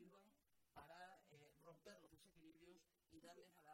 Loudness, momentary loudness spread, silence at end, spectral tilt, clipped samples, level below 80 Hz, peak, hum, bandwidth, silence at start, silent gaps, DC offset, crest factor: -66 LUFS; 6 LU; 0 s; -4 dB/octave; under 0.1%; -88 dBFS; -50 dBFS; none; 16 kHz; 0 s; none; under 0.1%; 18 dB